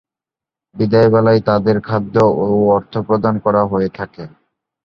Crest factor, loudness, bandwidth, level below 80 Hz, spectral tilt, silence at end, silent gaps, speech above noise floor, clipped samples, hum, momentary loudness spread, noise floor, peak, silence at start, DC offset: 14 dB; -15 LUFS; 7 kHz; -48 dBFS; -9 dB/octave; 0.55 s; none; 74 dB; under 0.1%; none; 10 LU; -88 dBFS; -2 dBFS; 0.75 s; under 0.1%